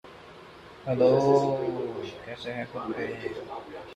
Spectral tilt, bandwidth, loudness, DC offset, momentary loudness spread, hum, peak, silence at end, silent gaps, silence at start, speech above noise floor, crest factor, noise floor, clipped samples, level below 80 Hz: -7 dB/octave; 10 kHz; -27 LUFS; under 0.1%; 26 LU; none; -10 dBFS; 0 s; none; 0.05 s; 21 dB; 18 dB; -48 dBFS; under 0.1%; -62 dBFS